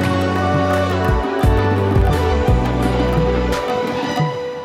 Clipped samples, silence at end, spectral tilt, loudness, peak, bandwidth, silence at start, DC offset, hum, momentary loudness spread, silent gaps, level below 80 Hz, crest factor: under 0.1%; 0 s; -7 dB/octave; -17 LUFS; -4 dBFS; 15.5 kHz; 0 s; under 0.1%; none; 4 LU; none; -24 dBFS; 12 dB